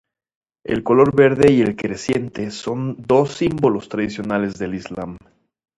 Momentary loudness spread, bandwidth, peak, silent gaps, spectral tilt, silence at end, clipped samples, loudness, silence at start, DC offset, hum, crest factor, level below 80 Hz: 14 LU; 11 kHz; 0 dBFS; none; -6.5 dB/octave; 0.6 s; under 0.1%; -18 LUFS; 0.7 s; under 0.1%; none; 18 dB; -48 dBFS